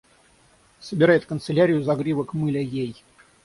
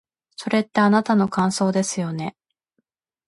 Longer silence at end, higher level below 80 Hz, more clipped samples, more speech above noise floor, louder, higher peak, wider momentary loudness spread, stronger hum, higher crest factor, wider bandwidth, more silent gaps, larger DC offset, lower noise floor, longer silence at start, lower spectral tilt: second, 0.5 s vs 0.95 s; first, -58 dBFS vs -64 dBFS; neither; second, 36 dB vs 54 dB; about the same, -22 LUFS vs -21 LUFS; about the same, -4 dBFS vs -6 dBFS; about the same, 13 LU vs 12 LU; neither; about the same, 18 dB vs 16 dB; about the same, 11.5 kHz vs 11.5 kHz; neither; neither; second, -57 dBFS vs -74 dBFS; first, 0.8 s vs 0.4 s; first, -7.5 dB/octave vs -5.5 dB/octave